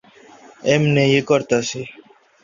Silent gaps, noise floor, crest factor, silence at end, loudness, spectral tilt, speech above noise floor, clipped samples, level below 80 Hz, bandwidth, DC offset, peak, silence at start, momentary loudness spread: none; -46 dBFS; 18 dB; 0.5 s; -18 LUFS; -5.5 dB/octave; 29 dB; under 0.1%; -58 dBFS; 7.4 kHz; under 0.1%; -2 dBFS; 0.65 s; 14 LU